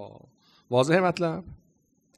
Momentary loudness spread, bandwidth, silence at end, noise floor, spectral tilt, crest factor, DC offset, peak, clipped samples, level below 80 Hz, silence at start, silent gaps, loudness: 16 LU; 12 kHz; 0.6 s; -67 dBFS; -6 dB/octave; 20 dB; under 0.1%; -8 dBFS; under 0.1%; -60 dBFS; 0 s; none; -25 LUFS